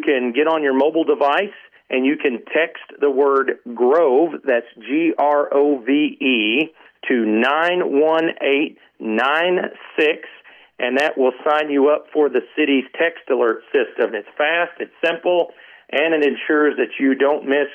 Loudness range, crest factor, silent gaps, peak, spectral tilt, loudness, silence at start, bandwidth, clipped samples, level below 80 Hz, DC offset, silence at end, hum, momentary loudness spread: 2 LU; 14 dB; none; -6 dBFS; -5.5 dB/octave; -18 LUFS; 0 s; 7.6 kHz; under 0.1%; -80 dBFS; under 0.1%; 0 s; none; 6 LU